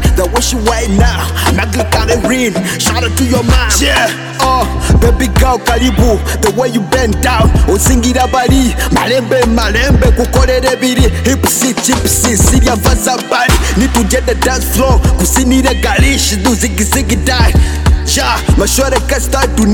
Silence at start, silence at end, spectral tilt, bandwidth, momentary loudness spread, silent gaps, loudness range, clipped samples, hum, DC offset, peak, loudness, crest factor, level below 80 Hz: 0 s; 0 s; -4.5 dB/octave; 19 kHz; 3 LU; none; 1 LU; under 0.1%; none; under 0.1%; 0 dBFS; -10 LUFS; 10 dB; -14 dBFS